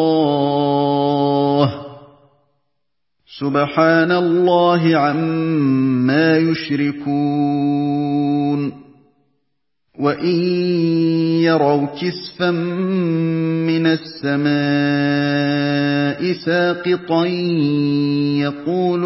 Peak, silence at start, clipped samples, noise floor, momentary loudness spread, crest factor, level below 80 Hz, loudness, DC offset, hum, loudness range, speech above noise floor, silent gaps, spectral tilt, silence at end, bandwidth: 0 dBFS; 0 s; under 0.1%; -78 dBFS; 6 LU; 16 dB; -60 dBFS; -17 LUFS; under 0.1%; none; 4 LU; 62 dB; none; -10.5 dB/octave; 0 s; 5.8 kHz